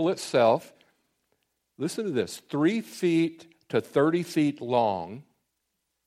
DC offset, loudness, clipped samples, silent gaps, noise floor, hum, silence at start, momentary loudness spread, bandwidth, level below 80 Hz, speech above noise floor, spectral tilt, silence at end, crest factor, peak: under 0.1%; -26 LUFS; under 0.1%; none; -79 dBFS; none; 0 s; 10 LU; 15 kHz; -72 dBFS; 54 dB; -6 dB/octave; 0.85 s; 20 dB; -8 dBFS